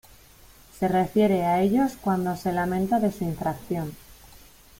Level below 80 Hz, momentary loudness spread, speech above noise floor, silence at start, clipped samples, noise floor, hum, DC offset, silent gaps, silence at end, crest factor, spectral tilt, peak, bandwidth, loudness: -52 dBFS; 9 LU; 28 dB; 0.75 s; under 0.1%; -52 dBFS; none; under 0.1%; none; 0.65 s; 16 dB; -7 dB/octave; -10 dBFS; 16.5 kHz; -25 LUFS